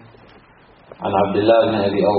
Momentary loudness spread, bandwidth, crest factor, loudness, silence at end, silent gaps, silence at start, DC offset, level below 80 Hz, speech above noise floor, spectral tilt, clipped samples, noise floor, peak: 7 LU; 4.6 kHz; 18 dB; -17 LUFS; 0 s; none; 1 s; under 0.1%; -54 dBFS; 33 dB; -5 dB/octave; under 0.1%; -49 dBFS; -2 dBFS